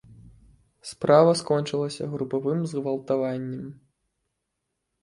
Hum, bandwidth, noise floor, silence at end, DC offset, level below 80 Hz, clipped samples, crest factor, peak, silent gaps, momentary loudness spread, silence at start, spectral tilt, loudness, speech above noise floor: none; 11.5 kHz; -80 dBFS; 1.3 s; under 0.1%; -64 dBFS; under 0.1%; 22 dB; -4 dBFS; none; 19 LU; 0.1 s; -6 dB/octave; -24 LUFS; 56 dB